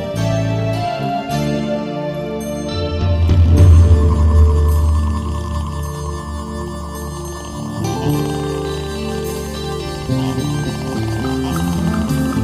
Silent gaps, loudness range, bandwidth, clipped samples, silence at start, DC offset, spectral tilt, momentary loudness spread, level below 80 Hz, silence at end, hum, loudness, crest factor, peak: none; 9 LU; 14.5 kHz; under 0.1%; 0 s; under 0.1%; -7 dB/octave; 13 LU; -22 dBFS; 0 s; none; -18 LUFS; 16 dB; 0 dBFS